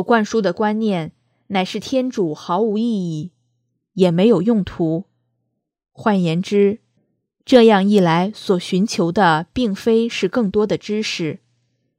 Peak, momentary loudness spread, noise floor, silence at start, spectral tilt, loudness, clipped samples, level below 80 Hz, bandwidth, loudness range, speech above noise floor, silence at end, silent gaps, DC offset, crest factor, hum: 0 dBFS; 11 LU; -74 dBFS; 0 s; -6 dB/octave; -18 LUFS; under 0.1%; -52 dBFS; 14 kHz; 5 LU; 57 dB; 0.6 s; none; under 0.1%; 18 dB; none